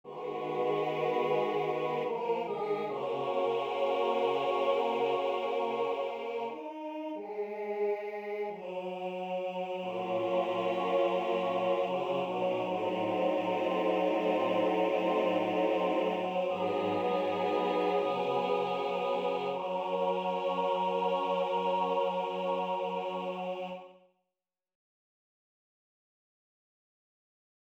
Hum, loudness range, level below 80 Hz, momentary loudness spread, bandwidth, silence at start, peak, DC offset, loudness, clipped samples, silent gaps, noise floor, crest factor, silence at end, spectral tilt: none; 7 LU; -78 dBFS; 8 LU; 8.4 kHz; 0.05 s; -18 dBFS; under 0.1%; -32 LUFS; under 0.1%; none; under -90 dBFS; 14 dB; 3.8 s; -6.5 dB/octave